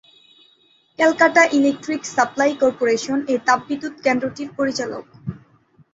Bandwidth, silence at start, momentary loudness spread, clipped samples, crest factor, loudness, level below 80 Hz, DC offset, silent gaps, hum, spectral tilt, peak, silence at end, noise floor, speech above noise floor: 8 kHz; 1 s; 14 LU; under 0.1%; 20 dB; -19 LUFS; -60 dBFS; under 0.1%; none; none; -4 dB/octave; -2 dBFS; 0.55 s; -58 dBFS; 39 dB